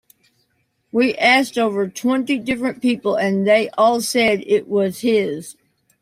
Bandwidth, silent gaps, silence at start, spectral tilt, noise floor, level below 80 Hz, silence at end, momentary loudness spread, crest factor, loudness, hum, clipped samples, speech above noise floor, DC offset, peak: 16 kHz; none; 0.95 s; -4.5 dB/octave; -67 dBFS; -60 dBFS; 0.5 s; 7 LU; 16 dB; -18 LUFS; none; under 0.1%; 49 dB; under 0.1%; -2 dBFS